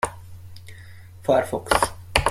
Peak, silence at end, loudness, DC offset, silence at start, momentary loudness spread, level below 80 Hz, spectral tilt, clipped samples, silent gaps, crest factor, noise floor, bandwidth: -2 dBFS; 0 s; -23 LUFS; under 0.1%; 0.05 s; 22 LU; -40 dBFS; -3.5 dB/octave; under 0.1%; none; 24 dB; -43 dBFS; 16.5 kHz